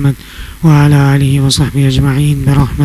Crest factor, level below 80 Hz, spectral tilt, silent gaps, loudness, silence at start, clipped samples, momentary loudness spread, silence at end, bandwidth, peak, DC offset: 10 dB; -24 dBFS; -6 dB/octave; none; -10 LUFS; 0 s; 0.3%; 8 LU; 0 s; 14.5 kHz; 0 dBFS; under 0.1%